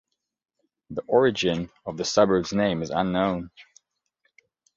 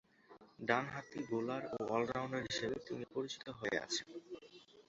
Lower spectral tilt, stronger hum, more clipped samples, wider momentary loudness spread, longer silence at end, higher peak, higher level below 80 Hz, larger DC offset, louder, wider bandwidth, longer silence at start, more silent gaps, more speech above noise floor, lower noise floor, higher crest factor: first, -5 dB/octave vs -3 dB/octave; neither; neither; about the same, 14 LU vs 14 LU; first, 1.15 s vs 0.1 s; first, -6 dBFS vs -16 dBFS; first, -56 dBFS vs -72 dBFS; neither; first, -24 LUFS vs -40 LUFS; about the same, 7.8 kHz vs 8 kHz; first, 0.9 s vs 0.3 s; neither; first, 59 dB vs 23 dB; first, -82 dBFS vs -63 dBFS; second, 20 dB vs 26 dB